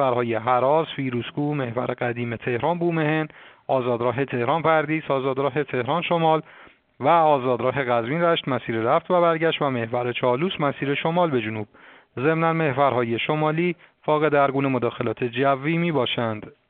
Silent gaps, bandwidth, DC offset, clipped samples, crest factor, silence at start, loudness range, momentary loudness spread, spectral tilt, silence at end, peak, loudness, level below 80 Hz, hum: none; 4.5 kHz; under 0.1%; under 0.1%; 18 dB; 0 s; 2 LU; 7 LU; -4.5 dB/octave; 0.2 s; -4 dBFS; -22 LUFS; -64 dBFS; none